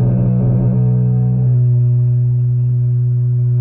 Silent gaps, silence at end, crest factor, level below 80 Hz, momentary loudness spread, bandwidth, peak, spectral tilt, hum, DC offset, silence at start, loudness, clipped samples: none; 0 s; 8 dB; -36 dBFS; 2 LU; 1.6 kHz; -6 dBFS; -15.5 dB/octave; none; under 0.1%; 0 s; -14 LUFS; under 0.1%